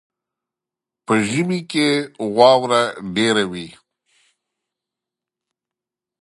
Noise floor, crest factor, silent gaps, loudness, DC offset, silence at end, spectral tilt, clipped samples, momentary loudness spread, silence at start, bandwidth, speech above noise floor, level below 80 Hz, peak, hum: -87 dBFS; 22 dB; none; -18 LUFS; under 0.1%; 2.5 s; -4.5 dB/octave; under 0.1%; 10 LU; 1.1 s; 11.5 kHz; 70 dB; -62 dBFS; 0 dBFS; none